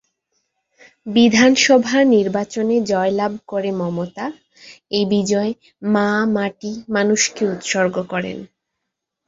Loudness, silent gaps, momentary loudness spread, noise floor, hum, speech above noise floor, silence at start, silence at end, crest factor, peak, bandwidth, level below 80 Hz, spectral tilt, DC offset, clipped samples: -18 LUFS; none; 13 LU; -79 dBFS; none; 62 dB; 1.05 s; 0.8 s; 16 dB; -2 dBFS; 7.8 kHz; -60 dBFS; -4 dB/octave; under 0.1%; under 0.1%